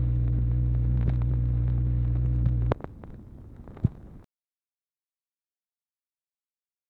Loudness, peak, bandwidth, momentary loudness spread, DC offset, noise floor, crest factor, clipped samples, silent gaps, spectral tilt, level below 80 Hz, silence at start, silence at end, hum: -27 LUFS; -8 dBFS; 2.9 kHz; 20 LU; under 0.1%; under -90 dBFS; 20 dB; under 0.1%; none; -11.5 dB/octave; -32 dBFS; 0 s; 2.7 s; none